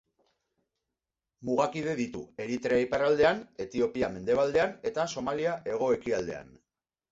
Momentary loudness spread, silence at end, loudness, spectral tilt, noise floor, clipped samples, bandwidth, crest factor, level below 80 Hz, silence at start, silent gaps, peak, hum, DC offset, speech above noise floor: 11 LU; 0.7 s; -29 LUFS; -5 dB/octave; -88 dBFS; under 0.1%; 7.8 kHz; 18 dB; -60 dBFS; 1.4 s; none; -12 dBFS; none; under 0.1%; 60 dB